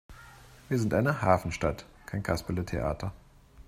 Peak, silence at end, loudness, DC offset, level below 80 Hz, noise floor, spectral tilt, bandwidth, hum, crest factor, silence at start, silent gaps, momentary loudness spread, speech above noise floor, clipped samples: -8 dBFS; 0.05 s; -30 LUFS; under 0.1%; -48 dBFS; -52 dBFS; -6.5 dB/octave; 15.5 kHz; none; 24 dB; 0.1 s; none; 13 LU; 23 dB; under 0.1%